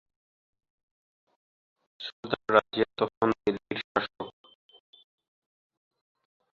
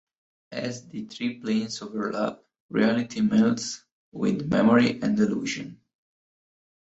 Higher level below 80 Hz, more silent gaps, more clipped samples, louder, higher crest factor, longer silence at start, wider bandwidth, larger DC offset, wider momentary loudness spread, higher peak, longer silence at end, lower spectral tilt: about the same, -66 dBFS vs -62 dBFS; about the same, 2.13-2.23 s, 3.17-3.21 s, 3.84-3.95 s vs 2.60-2.69 s, 3.92-4.12 s; neither; second, -29 LUFS vs -25 LUFS; first, 28 dB vs 20 dB; first, 2 s vs 0.5 s; about the same, 7.4 kHz vs 8 kHz; neither; about the same, 17 LU vs 15 LU; about the same, -4 dBFS vs -6 dBFS; first, 2.25 s vs 1.1 s; about the same, -6.5 dB/octave vs -5.5 dB/octave